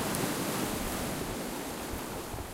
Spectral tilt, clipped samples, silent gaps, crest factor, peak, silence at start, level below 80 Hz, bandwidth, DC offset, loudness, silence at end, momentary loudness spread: -4 dB/octave; under 0.1%; none; 22 dB; -14 dBFS; 0 s; -48 dBFS; 16 kHz; under 0.1%; -34 LUFS; 0 s; 6 LU